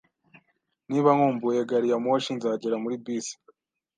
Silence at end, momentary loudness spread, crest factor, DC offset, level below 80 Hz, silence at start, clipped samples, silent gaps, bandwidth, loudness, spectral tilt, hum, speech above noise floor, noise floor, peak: 0.65 s; 11 LU; 20 dB; under 0.1%; -78 dBFS; 0.9 s; under 0.1%; none; 9.8 kHz; -25 LUFS; -5.5 dB/octave; none; 48 dB; -73 dBFS; -6 dBFS